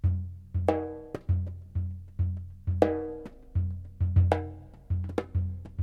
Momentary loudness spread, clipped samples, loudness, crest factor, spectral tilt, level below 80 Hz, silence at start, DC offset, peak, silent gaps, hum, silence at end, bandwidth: 11 LU; under 0.1%; -31 LUFS; 24 dB; -9.5 dB/octave; -40 dBFS; 0.05 s; under 0.1%; -4 dBFS; none; none; 0 s; 5 kHz